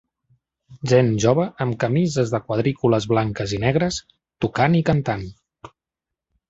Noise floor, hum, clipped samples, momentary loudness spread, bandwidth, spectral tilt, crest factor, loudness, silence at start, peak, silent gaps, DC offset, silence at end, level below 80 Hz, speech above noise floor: -86 dBFS; none; under 0.1%; 10 LU; 8 kHz; -6.5 dB/octave; 20 dB; -21 LUFS; 0.7 s; -2 dBFS; none; under 0.1%; 0.85 s; -48 dBFS; 66 dB